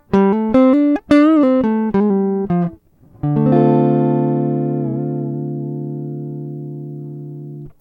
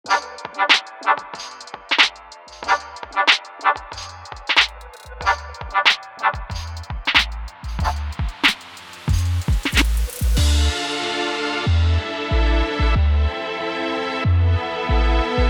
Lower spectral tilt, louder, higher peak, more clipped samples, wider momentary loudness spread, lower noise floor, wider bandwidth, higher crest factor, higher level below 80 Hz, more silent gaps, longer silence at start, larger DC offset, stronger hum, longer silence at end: first, -10 dB/octave vs -4 dB/octave; first, -16 LUFS vs -20 LUFS; about the same, 0 dBFS vs 0 dBFS; neither; about the same, 17 LU vs 15 LU; first, -45 dBFS vs -41 dBFS; second, 6.8 kHz vs 19 kHz; about the same, 16 dB vs 20 dB; second, -48 dBFS vs -24 dBFS; neither; about the same, 0.1 s vs 0.05 s; neither; first, 50 Hz at -50 dBFS vs none; about the same, 0.1 s vs 0 s